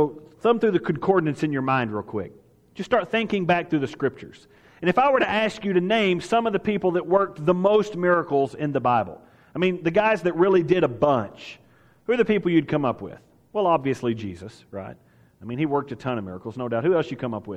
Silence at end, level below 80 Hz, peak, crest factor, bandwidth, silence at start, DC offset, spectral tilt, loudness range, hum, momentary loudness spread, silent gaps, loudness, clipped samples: 0 s; -58 dBFS; -6 dBFS; 18 dB; 9.8 kHz; 0 s; under 0.1%; -7 dB/octave; 6 LU; none; 16 LU; none; -23 LUFS; under 0.1%